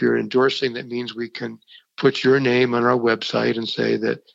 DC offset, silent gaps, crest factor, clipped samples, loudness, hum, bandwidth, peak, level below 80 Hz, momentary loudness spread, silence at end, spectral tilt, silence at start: under 0.1%; none; 18 dB; under 0.1%; -20 LUFS; none; 7.8 kHz; -4 dBFS; -70 dBFS; 12 LU; 0.15 s; -6 dB/octave; 0 s